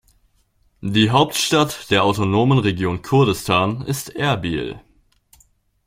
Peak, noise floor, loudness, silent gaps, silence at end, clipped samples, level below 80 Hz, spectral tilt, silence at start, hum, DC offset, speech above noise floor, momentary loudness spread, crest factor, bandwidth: -2 dBFS; -61 dBFS; -18 LUFS; none; 1.1 s; under 0.1%; -48 dBFS; -5 dB/octave; 0.8 s; none; under 0.1%; 43 dB; 10 LU; 18 dB; 16.5 kHz